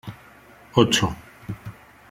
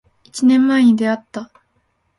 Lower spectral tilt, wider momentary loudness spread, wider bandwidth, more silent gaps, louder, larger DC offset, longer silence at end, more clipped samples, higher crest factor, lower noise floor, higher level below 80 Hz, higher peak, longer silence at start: about the same, -4.5 dB/octave vs -5 dB/octave; first, 22 LU vs 19 LU; first, 16 kHz vs 11.5 kHz; neither; second, -21 LUFS vs -15 LUFS; neither; second, 0.4 s vs 0.75 s; neither; first, 24 dB vs 12 dB; second, -49 dBFS vs -65 dBFS; first, -50 dBFS vs -62 dBFS; about the same, -2 dBFS vs -4 dBFS; second, 0.05 s vs 0.35 s